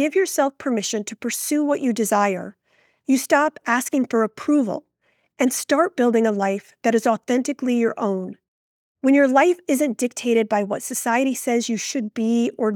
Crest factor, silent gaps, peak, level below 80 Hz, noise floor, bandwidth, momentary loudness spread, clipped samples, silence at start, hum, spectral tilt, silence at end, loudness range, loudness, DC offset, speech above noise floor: 18 dB; 8.48-8.95 s; -4 dBFS; -78 dBFS; -67 dBFS; 19.5 kHz; 7 LU; under 0.1%; 0 s; none; -4 dB/octave; 0 s; 2 LU; -21 LUFS; under 0.1%; 47 dB